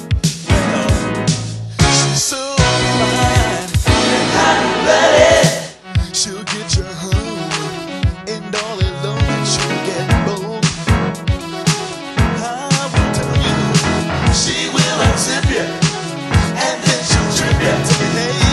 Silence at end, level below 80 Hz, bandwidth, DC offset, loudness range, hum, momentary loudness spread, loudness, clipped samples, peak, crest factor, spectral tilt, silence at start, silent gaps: 0 s; -26 dBFS; 13 kHz; under 0.1%; 6 LU; none; 8 LU; -15 LUFS; under 0.1%; 0 dBFS; 16 dB; -4 dB/octave; 0 s; none